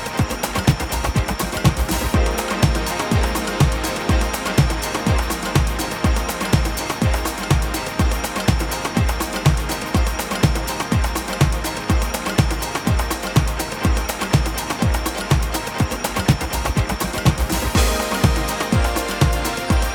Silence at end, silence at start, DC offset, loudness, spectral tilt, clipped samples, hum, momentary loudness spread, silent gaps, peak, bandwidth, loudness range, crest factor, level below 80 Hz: 0 s; 0 s; under 0.1%; -20 LUFS; -5 dB/octave; under 0.1%; none; 3 LU; none; -2 dBFS; over 20 kHz; 1 LU; 18 dB; -24 dBFS